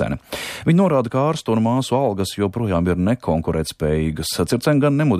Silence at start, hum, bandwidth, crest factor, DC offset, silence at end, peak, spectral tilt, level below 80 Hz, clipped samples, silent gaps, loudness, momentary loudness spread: 0 s; none; 15.5 kHz; 14 dB; under 0.1%; 0 s; -6 dBFS; -6.5 dB/octave; -40 dBFS; under 0.1%; none; -20 LUFS; 6 LU